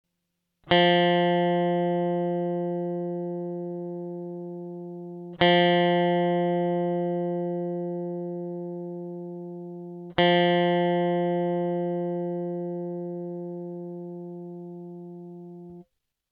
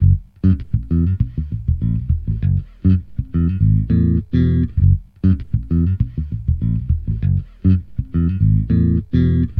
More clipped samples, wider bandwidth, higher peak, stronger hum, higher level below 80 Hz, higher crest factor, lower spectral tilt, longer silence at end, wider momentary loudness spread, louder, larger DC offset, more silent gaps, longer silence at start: neither; first, 5 kHz vs 4.1 kHz; about the same, -4 dBFS vs -4 dBFS; first, 50 Hz at -80 dBFS vs none; second, -68 dBFS vs -24 dBFS; first, 22 dB vs 14 dB; second, -9.5 dB/octave vs -12 dB/octave; first, 0.5 s vs 0 s; first, 18 LU vs 6 LU; second, -26 LUFS vs -18 LUFS; neither; neither; first, 0.65 s vs 0 s